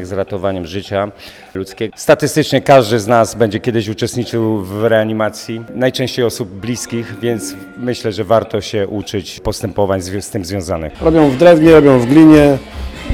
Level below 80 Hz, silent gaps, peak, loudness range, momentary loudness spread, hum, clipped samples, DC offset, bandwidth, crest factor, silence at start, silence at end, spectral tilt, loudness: -36 dBFS; none; 0 dBFS; 8 LU; 15 LU; none; 0.3%; under 0.1%; 15.5 kHz; 14 dB; 0 s; 0 s; -6 dB/octave; -13 LUFS